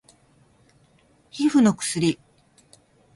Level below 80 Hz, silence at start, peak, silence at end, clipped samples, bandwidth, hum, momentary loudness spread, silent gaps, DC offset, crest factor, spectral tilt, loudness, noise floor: -64 dBFS; 1.35 s; -6 dBFS; 1 s; under 0.1%; 11.5 kHz; none; 16 LU; none; under 0.1%; 20 dB; -5 dB/octave; -21 LUFS; -59 dBFS